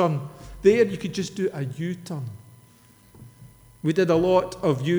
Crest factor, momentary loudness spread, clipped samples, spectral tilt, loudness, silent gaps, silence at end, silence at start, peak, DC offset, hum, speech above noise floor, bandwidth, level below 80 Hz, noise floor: 18 dB; 14 LU; under 0.1%; -6.5 dB/octave; -24 LUFS; none; 0 s; 0 s; -6 dBFS; under 0.1%; none; 31 dB; over 20 kHz; -52 dBFS; -54 dBFS